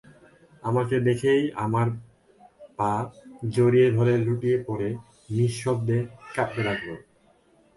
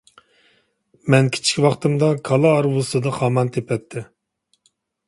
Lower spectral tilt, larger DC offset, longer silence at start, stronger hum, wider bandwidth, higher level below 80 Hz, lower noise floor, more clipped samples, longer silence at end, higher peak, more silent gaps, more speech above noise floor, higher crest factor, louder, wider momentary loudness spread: first, -7.5 dB/octave vs -5.5 dB/octave; neither; second, 0.65 s vs 1.05 s; neither; about the same, 11.5 kHz vs 11.5 kHz; about the same, -58 dBFS vs -58 dBFS; second, -61 dBFS vs -68 dBFS; neither; second, 0.8 s vs 1.05 s; second, -10 dBFS vs -2 dBFS; neither; second, 37 dB vs 50 dB; about the same, 16 dB vs 20 dB; second, -25 LUFS vs -19 LUFS; first, 15 LU vs 10 LU